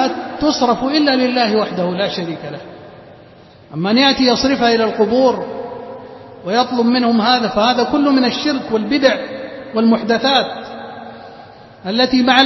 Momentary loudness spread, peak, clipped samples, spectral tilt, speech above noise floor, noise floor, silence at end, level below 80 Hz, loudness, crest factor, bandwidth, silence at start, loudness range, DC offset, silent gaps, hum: 17 LU; 0 dBFS; under 0.1%; -4.5 dB/octave; 28 dB; -42 dBFS; 0 s; -50 dBFS; -15 LUFS; 16 dB; 6.2 kHz; 0 s; 3 LU; under 0.1%; none; none